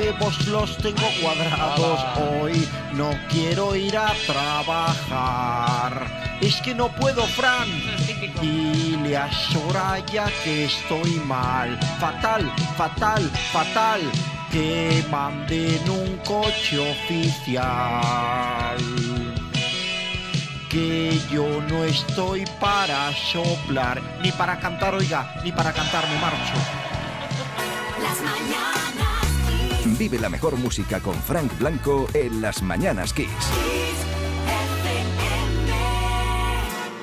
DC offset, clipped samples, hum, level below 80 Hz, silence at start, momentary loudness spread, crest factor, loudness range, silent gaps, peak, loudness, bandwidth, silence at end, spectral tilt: under 0.1%; under 0.1%; none; -34 dBFS; 0 s; 5 LU; 16 dB; 2 LU; none; -6 dBFS; -23 LUFS; 16 kHz; 0 s; -4.5 dB/octave